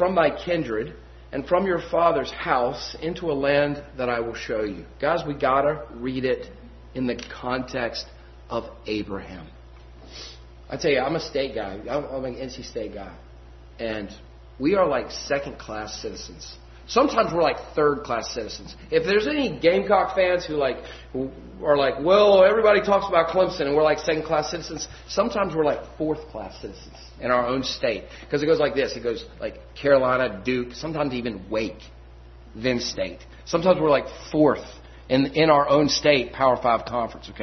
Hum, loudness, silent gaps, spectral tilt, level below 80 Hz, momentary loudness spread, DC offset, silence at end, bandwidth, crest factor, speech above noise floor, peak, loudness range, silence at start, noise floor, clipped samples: none; -23 LUFS; none; -5 dB/octave; -46 dBFS; 16 LU; under 0.1%; 0 s; 6.4 kHz; 22 dB; 22 dB; -2 dBFS; 9 LU; 0 s; -45 dBFS; under 0.1%